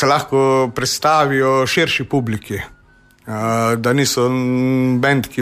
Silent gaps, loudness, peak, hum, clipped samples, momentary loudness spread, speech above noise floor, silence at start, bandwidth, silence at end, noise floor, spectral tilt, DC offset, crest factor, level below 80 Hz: none; -16 LUFS; -2 dBFS; none; under 0.1%; 9 LU; 34 dB; 0 s; 15.5 kHz; 0 s; -50 dBFS; -5 dB/octave; under 0.1%; 14 dB; -48 dBFS